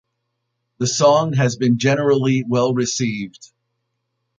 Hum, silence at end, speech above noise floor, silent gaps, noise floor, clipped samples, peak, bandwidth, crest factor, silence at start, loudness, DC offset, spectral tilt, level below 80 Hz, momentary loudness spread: none; 0.95 s; 57 dB; none; -75 dBFS; under 0.1%; -2 dBFS; 9.4 kHz; 16 dB; 0.8 s; -18 LUFS; under 0.1%; -5 dB/octave; -58 dBFS; 9 LU